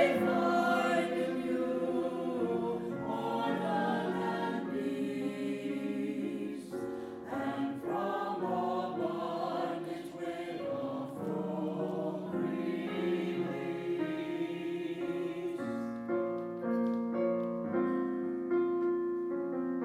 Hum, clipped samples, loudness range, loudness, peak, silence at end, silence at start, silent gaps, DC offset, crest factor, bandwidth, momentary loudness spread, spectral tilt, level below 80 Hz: none; under 0.1%; 4 LU; -34 LUFS; -14 dBFS; 0 s; 0 s; none; under 0.1%; 20 dB; 14.5 kHz; 6 LU; -7 dB/octave; -74 dBFS